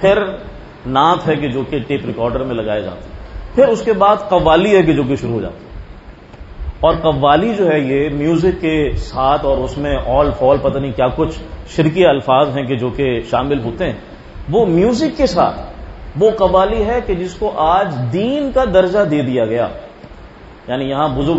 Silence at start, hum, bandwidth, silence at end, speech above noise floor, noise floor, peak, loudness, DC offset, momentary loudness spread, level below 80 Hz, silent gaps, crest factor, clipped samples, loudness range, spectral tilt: 0 s; none; 8 kHz; 0 s; 22 dB; -37 dBFS; 0 dBFS; -15 LUFS; under 0.1%; 17 LU; -32 dBFS; none; 16 dB; under 0.1%; 2 LU; -7 dB/octave